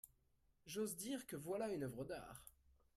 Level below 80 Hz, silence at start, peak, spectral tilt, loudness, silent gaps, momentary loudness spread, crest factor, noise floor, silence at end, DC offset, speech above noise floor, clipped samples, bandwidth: -74 dBFS; 0.05 s; -34 dBFS; -4.5 dB/octave; -47 LUFS; none; 19 LU; 16 dB; -79 dBFS; 0.25 s; under 0.1%; 32 dB; under 0.1%; 16 kHz